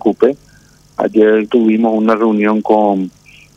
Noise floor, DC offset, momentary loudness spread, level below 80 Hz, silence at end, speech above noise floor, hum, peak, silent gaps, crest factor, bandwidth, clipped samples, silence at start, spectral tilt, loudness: -46 dBFS; under 0.1%; 10 LU; -56 dBFS; 0.5 s; 34 dB; none; 0 dBFS; none; 12 dB; 7.4 kHz; under 0.1%; 0.05 s; -8 dB/octave; -13 LUFS